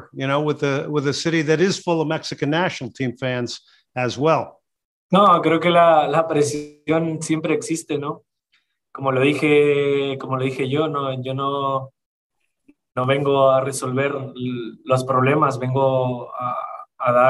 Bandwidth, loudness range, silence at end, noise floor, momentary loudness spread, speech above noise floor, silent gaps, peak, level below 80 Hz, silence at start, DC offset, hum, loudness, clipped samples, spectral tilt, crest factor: 12.5 kHz; 5 LU; 0 s; -67 dBFS; 12 LU; 48 dB; 4.85-5.09 s, 12.06-12.30 s; -4 dBFS; -66 dBFS; 0 s; under 0.1%; none; -20 LUFS; under 0.1%; -5.5 dB/octave; 16 dB